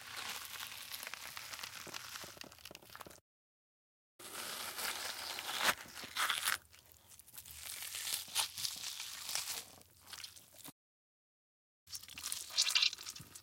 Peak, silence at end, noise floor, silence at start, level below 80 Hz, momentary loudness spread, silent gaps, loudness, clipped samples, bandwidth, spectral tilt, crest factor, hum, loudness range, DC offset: -14 dBFS; 0 s; -63 dBFS; 0 s; -76 dBFS; 19 LU; 3.21-4.19 s, 10.72-11.87 s; -39 LUFS; under 0.1%; 17 kHz; 1 dB/octave; 28 dB; none; 10 LU; under 0.1%